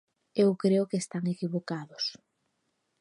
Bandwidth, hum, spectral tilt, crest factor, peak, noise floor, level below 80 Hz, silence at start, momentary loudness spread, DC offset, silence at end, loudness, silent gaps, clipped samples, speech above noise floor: 11 kHz; none; -6 dB/octave; 18 dB; -12 dBFS; -78 dBFS; -80 dBFS; 0.35 s; 9 LU; under 0.1%; 0.85 s; -30 LUFS; none; under 0.1%; 49 dB